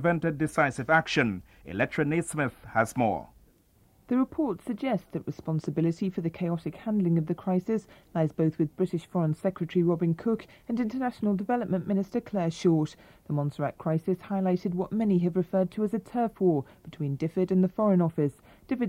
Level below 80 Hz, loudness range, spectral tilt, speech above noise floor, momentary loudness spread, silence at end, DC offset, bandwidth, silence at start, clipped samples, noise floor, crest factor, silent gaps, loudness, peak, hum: -60 dBFS; 3 LU; -7.5 dB/octave; 35 dB; 7 LU; 0 s; under 0.1%; 13.5 kHz; 0 s; under 0.1%; -62 dBFS; 20 dB; none; -28 LUFS; -8 dBFS; none